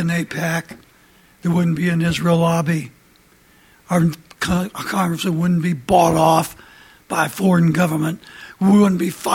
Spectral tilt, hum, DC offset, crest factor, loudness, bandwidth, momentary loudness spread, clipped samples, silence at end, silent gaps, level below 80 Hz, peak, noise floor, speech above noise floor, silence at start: -6 dB/octave; none; under 0.1%; 16 dB; -18 LUFS; 16.5 kHz; 11 LU; under 0.1%; 0 s; none; -48 dBFS; -2 dBFS; -53 dBFS; 35 dB; 0 s